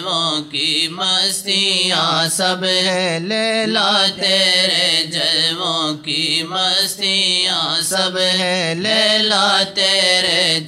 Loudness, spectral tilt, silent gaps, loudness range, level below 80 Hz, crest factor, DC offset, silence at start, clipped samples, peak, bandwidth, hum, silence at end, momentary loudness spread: -15 LUFS; -2 dB/octave; none; 1 LU; -64 dBFS; 16 dB; under 0.1%; 0 s; under 0.1%; -2 dBFS; 16 kHz; none; 0 s; 5 LU